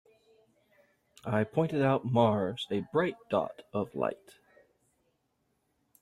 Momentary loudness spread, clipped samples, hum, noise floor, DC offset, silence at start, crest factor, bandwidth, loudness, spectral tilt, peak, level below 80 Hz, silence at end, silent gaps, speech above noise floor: 10 LU; under 0.1%; none; -77 dBFS; under 0.1%; 1.25 s; 22 dB; 13.5 kHz; -31 LUFS; -7.5 dB/octave; -10 dBFS; -70 dBFS; 1.85 s; none; 47 dB